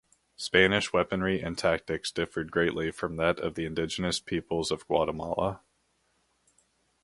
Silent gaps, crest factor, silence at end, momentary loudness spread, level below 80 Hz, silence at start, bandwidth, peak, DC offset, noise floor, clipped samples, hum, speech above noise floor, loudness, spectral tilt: none; 24 dB; 1.45 s; 9 LU; -52 dBFS; 0.4 s; 11.5 kHz; -6 dBFS; under 0.1%; -72 dBFS; under 0.1%; none; 44 dB; -29 LUFS; -4.5 dB/octave